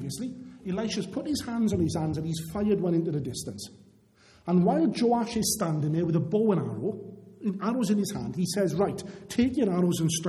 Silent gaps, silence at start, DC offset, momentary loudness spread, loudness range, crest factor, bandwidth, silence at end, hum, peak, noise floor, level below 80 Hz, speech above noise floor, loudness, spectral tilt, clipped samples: none; 0 s; under 0.1%; 11 LU; 3 LU; 16 dB; 15 kHz; 0 s; none; -12 dBFS; -59 dBFS; -56 dBFS; 32 dB; -28 LUFS; -6 dB/octave; under 0.1%